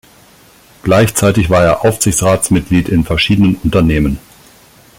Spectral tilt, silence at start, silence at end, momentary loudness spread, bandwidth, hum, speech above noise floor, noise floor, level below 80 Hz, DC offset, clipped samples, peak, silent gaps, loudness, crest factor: -5 dB/octave; 0.85 s; 0.8 s; 4 LU; 17 kHz; none; 33 dB; -44 dBFS; -30 dBFS; under 0.1%; under 0.1%; 0 dBFS; none; -12 LUFS; 12 dB